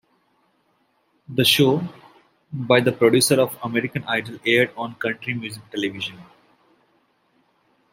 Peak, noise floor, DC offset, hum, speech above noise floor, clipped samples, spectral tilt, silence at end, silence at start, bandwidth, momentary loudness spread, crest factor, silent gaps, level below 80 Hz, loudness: -2 dBFS; -66 dBFS; under 0.1%; none; 45 dB; under 0.1%; -4 dB/octave; 1.7 s; 1.3 s; 16 kHz; 15 LU; 20 dB; none; -64 dBFS; -21 LUFS